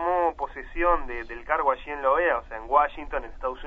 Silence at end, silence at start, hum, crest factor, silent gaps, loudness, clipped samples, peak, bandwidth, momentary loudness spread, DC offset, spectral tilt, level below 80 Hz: 0 s; 0 s; none; 20 dB; none; -26 LUFS; under 0.1%; -6 dBFS; 6 kHz; 11 LU; under 0.1%; -6.5 dB/octave; -40 dBFS